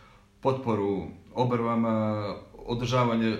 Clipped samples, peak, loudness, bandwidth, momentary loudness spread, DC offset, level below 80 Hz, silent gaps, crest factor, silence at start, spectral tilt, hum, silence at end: under 0.1%; -12 dBFS; -28 LUFS; 9.4 kHz; 10 LU; under 0.1%; -56 dBFS; none; 16 dB; 0.45 s; -7.5 dB/octave; none; 0 s